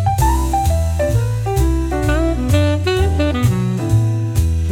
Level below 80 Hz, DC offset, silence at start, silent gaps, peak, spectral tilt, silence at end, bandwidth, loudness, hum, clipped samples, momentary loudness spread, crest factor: -22 dBFS; under 0.1%; 0 s; none; -4 dBFS; -6.5 dB/octave; 0 s; 17 kHz; -17 LUFS; none; under 0.1%; 2 LU; 12 dB